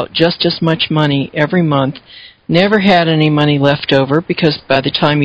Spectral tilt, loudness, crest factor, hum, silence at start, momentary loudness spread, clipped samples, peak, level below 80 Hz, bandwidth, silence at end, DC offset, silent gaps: -7.5 dB/octave; -13 LUFS; 12 dB; none; 0 s; 5 LU; 0.4%; 0 dBFS; -46 dBFS; 8 kHz; 0 s; under 0.1%; none